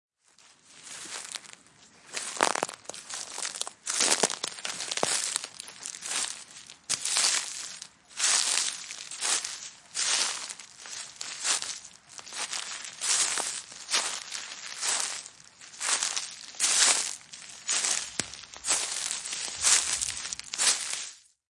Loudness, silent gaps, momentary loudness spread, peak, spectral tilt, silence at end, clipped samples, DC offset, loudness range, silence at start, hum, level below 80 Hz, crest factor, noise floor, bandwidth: -28 LUFS; none; 17 LU; -2 dBFS; 1.5 dB/octave; 0.3 s; under 0.1%; under 0.1%; 4 LU; 0.7 s; none; -70 dBFS; 28 dB; -60 dBFS; 11.5 kHz